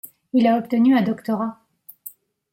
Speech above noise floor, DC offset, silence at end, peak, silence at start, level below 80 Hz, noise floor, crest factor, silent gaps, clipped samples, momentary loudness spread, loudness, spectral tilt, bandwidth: 25 dB; under 0.1%; 0.45 s; -6 dBFS; 0.05 s; -68 dBFS; -44 dBFS; 16 dB; none; under 0.1%; 22 LU; -20 LUFS; -7 dB/octave; 16.5 kHz